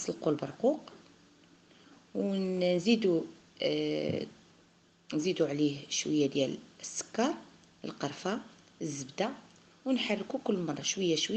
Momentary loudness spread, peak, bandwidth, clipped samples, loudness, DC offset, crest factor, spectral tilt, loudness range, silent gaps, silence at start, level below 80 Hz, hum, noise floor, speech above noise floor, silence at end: 12 LU; -14 dBFS; 9 kHz; under 0.1%; -33 LUFS; under 0.1%; 20 dB; -4.5 dB/octave; 4 LU; none; 0 s; -76 dBFS; none; -64 dBFS; 32 dB; 0 s